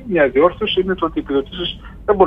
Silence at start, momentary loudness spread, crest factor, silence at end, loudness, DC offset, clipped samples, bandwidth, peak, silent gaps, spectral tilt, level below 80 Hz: 0 s; 11 LU; 16 dB; 0 s; -18 LUFS; under 0.1%; under 0.1%; 5.2 kHz; 0 dBFS; none; -8 dB/octave; -38 dBFS